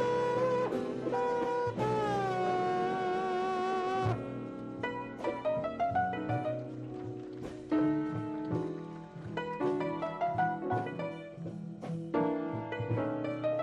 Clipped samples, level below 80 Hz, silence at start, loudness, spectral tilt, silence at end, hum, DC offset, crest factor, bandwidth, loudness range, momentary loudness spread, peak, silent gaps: under 0.1%; -64 dBFS; 0 s; -34 LUFS; -7.5 dB/octave; 0 s; none; under 0.1%; 14 dB; 10.5 kHz; 4 LU; 11 LU; -18 dBFS; none